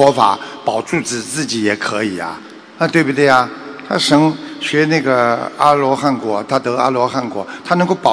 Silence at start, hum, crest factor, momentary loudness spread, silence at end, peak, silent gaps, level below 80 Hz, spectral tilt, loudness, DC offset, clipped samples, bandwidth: 0 s; none; 16 dB; 10 LU; 0 s; 0 dBFS; none; -60 dBFS; -4.5 dB/octave; -15 LUFS; under 0.1%; 0.3%; 11 kHz